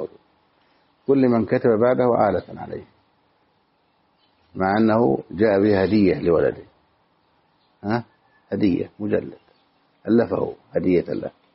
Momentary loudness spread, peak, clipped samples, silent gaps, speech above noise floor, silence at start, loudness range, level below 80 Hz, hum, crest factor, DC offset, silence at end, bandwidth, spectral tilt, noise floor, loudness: 16 LU; -6 dBFS; under 0.1%; none; 45 dB; 0 s; 5 LU; -54 dBFS; none; 16 dB; under 0.1%; 0.25 s; 5.8 kHz; -7 dB/octave; -64 dBFS; -20 LUFS